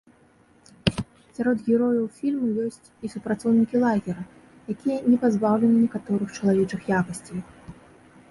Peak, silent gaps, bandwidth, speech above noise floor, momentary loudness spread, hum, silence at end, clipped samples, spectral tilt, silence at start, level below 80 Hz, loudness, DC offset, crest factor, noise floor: -4 dBFS; none; 11.5 kHz; 34 dB; 15 LU; none; 0.6 s; under 0.1%; -7 dB/octave; 0.85 s; -54 dBFS; -24 LUFS; under 0.1%; 22 dB; -57 dBFS